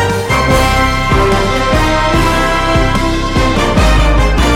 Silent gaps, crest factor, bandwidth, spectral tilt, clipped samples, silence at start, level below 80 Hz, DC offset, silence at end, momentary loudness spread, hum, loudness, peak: none; 10 dB; 16.5 kHz; -5 dB/octave; under 0.1%; 0 s; -16 dBFS; under 0.1%; 0 s; 2 LU; none; -11 LUFS; 0 dBFS